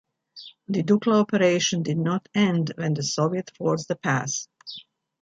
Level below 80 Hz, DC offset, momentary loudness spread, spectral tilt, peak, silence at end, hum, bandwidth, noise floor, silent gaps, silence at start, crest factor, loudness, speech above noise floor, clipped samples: -66 dBFS; under 0.1%; 19 LU; -5 dB/octave; -8 dBFS; 0.4 s; none; 8.6 kHz; -47 dBFS; none; 0.35 s; 16 dB; -24 LUFS; 24 dB; under 0.1%